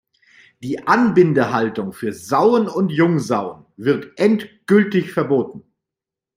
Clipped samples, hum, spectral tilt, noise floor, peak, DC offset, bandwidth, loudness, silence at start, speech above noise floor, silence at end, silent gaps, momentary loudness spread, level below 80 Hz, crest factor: under 0.1%; none; -7 dB/octave; -87 dBFS; -2 dBFS; under 0.1%; 16 kHz; -18 LUFS; 0.6 s; 69 dB; 0.75 s; none; 11 LU; -62 dBFS; 18 dB